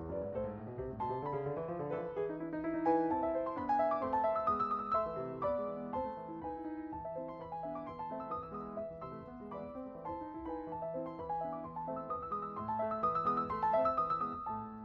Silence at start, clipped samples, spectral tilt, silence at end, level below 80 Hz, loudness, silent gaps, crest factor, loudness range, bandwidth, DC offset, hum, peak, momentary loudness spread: 0 s; under 0.1%; -9.5 dB/octave; 0 s; -62 dBFS; -38 LUFS; none; 18 dB; 9 LU; 6.4 kHz; under 0.1%; none; -20 dBFS; 11 LU